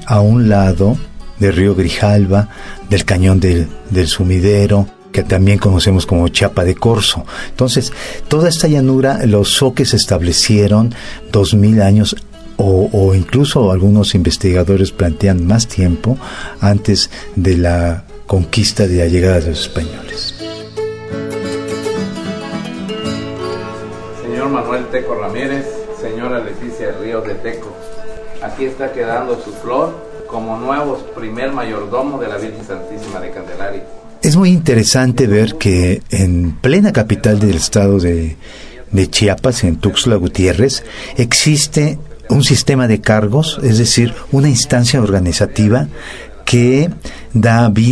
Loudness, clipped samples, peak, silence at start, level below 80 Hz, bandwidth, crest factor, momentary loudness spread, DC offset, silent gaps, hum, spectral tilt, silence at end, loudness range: -13 LUFS; under 0.1%; 0 dBFS; 0 s; -30 dBFS; 11 kHz; 12 dB; 15 LU; under 0.1%; none; none; -5.5 dB/octave; 0 s; 9 LU